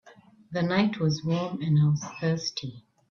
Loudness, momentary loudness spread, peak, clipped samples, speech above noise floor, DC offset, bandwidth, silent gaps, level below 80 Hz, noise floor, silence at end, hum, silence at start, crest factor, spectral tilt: -27 LUFS; 11 LU; -10 dBFS; under 0.1%; 26 dB; under 0.1%; 6.8 kHz; none; -64 dBFS; -52 dBFS; 0.3 s; none; 0.5 s; 16 dB; -6.5 dB/octave